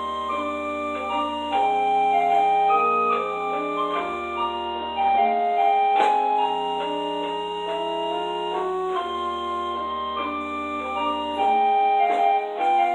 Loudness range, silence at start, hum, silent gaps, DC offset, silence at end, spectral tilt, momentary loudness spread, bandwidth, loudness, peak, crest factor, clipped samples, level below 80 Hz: 5 LU; 0 s; none; none; under 0.1%; 0 s; -4.5 dB/octave; 8 LU; 9.4 kHz; -23 LUFS; -6 dBFS; 16 dB; under 0.1%; -56 dBFS